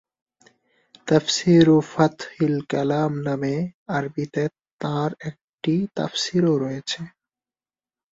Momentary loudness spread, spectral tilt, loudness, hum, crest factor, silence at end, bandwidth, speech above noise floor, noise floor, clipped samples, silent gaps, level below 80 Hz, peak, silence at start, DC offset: 12 LU; -6 dB/octave; -22 LUFS; none; 20 dB; 1.05 s; 7.8 kHz; over 69 dB; under -90 dBFS; under 0.1%; 3.74-3.86 s, 4.73-4.79 s, 5.44-5.58 s; -60 dBFS; -2 dBFS; 1.05 s; under 0.1%